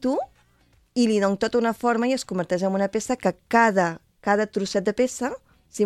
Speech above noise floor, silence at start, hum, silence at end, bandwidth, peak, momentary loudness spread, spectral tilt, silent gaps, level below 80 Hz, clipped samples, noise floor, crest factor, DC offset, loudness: 38 dB; 0 s; none; 0 s; 13.5 kHz; -4 dBFS; 11 LU; -5 dB/octave; none; -60 dBFS; under 0.1%; -61 dBFS; 20 dB; under 0.1%; -23 LUFS